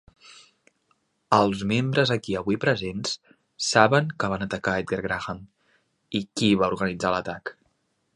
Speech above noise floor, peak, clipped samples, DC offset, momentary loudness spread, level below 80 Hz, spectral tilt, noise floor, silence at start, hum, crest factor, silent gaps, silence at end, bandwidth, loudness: 47 dB; -2 dBFS; under 0.1%; under 0.1%; 12 LU; -54 dBFS; -5 dB/octave; -71 dBFS; 0.3 s; none; 24 dB; none; 0.65 s; 11.5 kHz; -24 LUFS